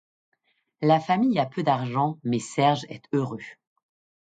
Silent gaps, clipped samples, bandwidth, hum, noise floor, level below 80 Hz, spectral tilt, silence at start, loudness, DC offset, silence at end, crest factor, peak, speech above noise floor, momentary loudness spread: none; under 0.1%; 9.4 kHz; none; -70 dBFS; -70 dBFS; -6.5 dB/octave; 0.8 s; -25 LUFS; under 0.1%; 0.7 s; 18 dB; -8 dBFS; 46 dB; 9 LU